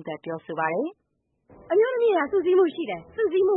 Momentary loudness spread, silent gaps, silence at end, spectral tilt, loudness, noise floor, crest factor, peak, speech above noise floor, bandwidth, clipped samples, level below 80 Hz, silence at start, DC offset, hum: 12 LU; none; 0 s; -10 dB/octave; -24 LUFS; -61 dBFS; 14 dB; -10 dBFS; 38 dB; 4 kHz; under 0.1%; -66 dBFS; 0 s; under 0.1%; none